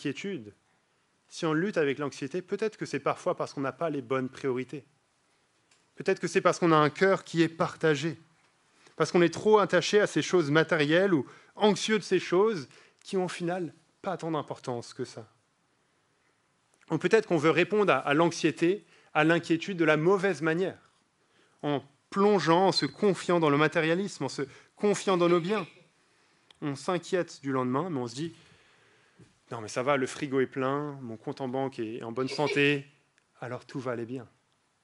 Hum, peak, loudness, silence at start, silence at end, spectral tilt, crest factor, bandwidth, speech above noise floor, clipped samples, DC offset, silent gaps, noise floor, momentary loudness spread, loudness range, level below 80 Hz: none; -8 dBFS; -28 LUFS; 0 s; 0.6 s; -5.5 dB/octave; 22 dB; 11.5 kHz; 44 dB; under 0.1%; under 0.1%; none; -71 dBFS; 14 LU; 8 LU; -78 dBFS